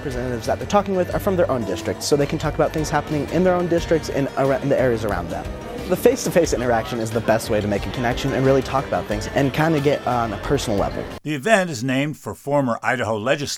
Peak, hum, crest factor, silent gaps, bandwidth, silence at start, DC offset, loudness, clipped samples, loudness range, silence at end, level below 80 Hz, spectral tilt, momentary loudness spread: 0 dBFS; none; 20 dB; none; 17 kHz; 0 s; under 0.1%; -21 LUFS; under 0.1%; 1 LU; 0 s; -38 dBFS; -5.5 dB/octave; 7 LU